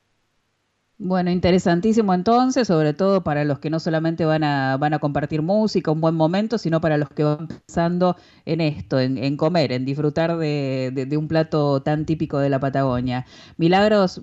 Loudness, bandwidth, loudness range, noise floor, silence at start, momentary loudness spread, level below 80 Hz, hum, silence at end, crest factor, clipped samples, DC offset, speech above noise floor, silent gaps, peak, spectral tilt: -21 LUFS; 8 kHz; 3 LU; -70 dBFS; 1 s; 6 LU; -50 dBFS; none; 0 s; 14 dB; under 0.1%; under 0.1%; 50 dB; none; -6 dBFS; -7 dB/octave